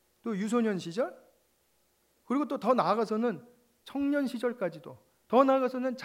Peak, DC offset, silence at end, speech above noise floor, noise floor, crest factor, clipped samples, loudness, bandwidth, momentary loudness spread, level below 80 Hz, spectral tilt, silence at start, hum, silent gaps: -10 dBFS; under 0.1%; 0 s; 42 dB; -71 dBFS; 22 dB; under 0.1%; -30 LUFS; 16 kHz; 11 LU; -78 dBFS; -6.5 dB/octave; 0.25 s; none; none